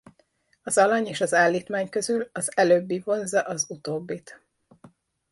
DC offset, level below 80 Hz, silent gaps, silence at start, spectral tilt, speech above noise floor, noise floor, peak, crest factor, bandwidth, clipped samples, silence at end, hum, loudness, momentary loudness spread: under 0.1%; -72 dBFS; none; 0.65 s; -3.5 dB/octave; 42 dB; -66 dBFS; -6 dBFS; 18 dB; 11.5 kHz; under 0.1%; 0.45 s; none; -24 LUFS; 12 LU